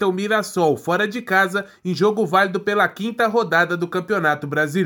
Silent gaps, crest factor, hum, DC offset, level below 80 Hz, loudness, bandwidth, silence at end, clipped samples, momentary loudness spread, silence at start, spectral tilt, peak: none; 16 dB; none; under 0.1%; -68 dBFS; -19 LUFS; 19 kHz; 0 s; under 0.1%; 4 LU; 0 s; -5.5 dB/octave; -4 dBFS